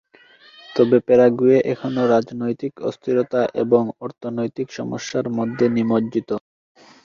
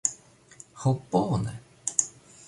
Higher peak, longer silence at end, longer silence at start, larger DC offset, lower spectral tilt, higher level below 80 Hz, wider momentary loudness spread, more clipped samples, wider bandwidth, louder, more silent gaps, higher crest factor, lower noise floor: about the same, -2 dBFS vs -2 dBFS; first, 0.65 s vs 0.05 s; first, 0.7 s vs 0.05 s; neither; first, -7 dB/octave vs -5.5 dB/octave; about the same, -60 dBFS vs -56 dBFS; second, 13 LU vs 22 LU; neither; second, 7.4 kHz vs 11.5 kHz; first, -20 LUFS vs -28 LUFS; neither; second, 18 dB vs 28 dB; about the same, -50 dBFS vs -53 dBFS